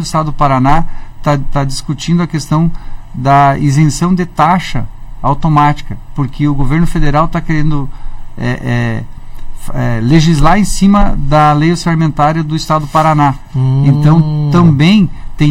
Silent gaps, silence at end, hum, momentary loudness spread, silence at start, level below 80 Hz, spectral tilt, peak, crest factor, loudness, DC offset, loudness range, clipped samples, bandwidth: none; 0 s; none; 11 LU; 0 s; -20 dBFS; -6.5 dB/octave; 0 dBFS; 10 dB; -11 LUFS; under 0.1%; 5 LU; 0.5%; 13 kHz